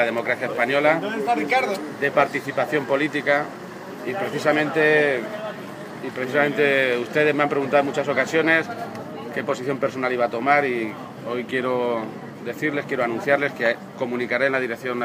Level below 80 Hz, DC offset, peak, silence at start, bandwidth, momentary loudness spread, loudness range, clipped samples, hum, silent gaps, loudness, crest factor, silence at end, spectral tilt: -70 dBFS; under 0.1%; -2 dBFS; 0 s; 15.5 kHz; 13 LU; 3 LU; under 0.1%; none; none; -22 LUFS; 20 dB; 0 s; -5.5 dB/octave